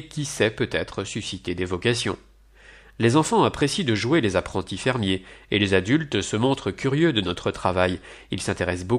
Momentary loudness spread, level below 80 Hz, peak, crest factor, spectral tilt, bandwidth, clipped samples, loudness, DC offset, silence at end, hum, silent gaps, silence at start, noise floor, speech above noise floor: 9 LU; -48 dBFS; -4 dBFS; 20 dB; -5 dB/octave; 13.5 kHz; under 0.1%; -23 LUFS; under 0.1%; 0 s; none; none; 0 s; -50 dBFS; 27 dB